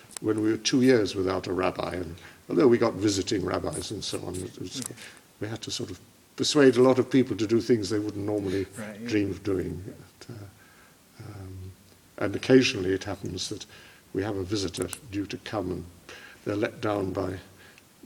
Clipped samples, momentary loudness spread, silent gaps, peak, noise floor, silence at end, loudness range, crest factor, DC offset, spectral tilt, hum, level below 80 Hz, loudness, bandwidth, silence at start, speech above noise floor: under 0.1%; 23 LU; none; -8 dBFS; -55 dBFS; 0.6 s; 9 LU; 20 dB; under 0.1%; -5 dB/octave; none; -60 dBFS; -27 LUFS; 18 kHz; 0.1 s; 29 dB